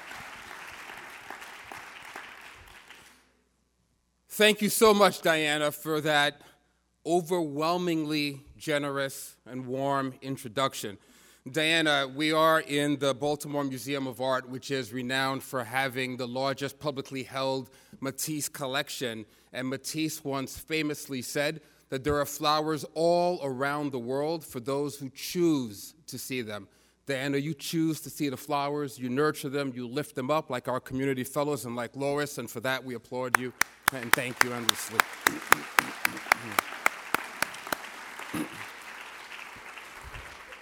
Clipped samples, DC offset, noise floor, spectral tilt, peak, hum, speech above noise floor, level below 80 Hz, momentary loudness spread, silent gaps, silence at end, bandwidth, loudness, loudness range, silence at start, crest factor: under 0.1%; under 0.1%; -72 dBFS; -3.5 dB/octave; 0 dBFS; none; 43 dB; -64 dBFS; 18 LU; none; 0 s; 19.5 kHz; -29 LUFS; 7 LU; 0 s; 30 dB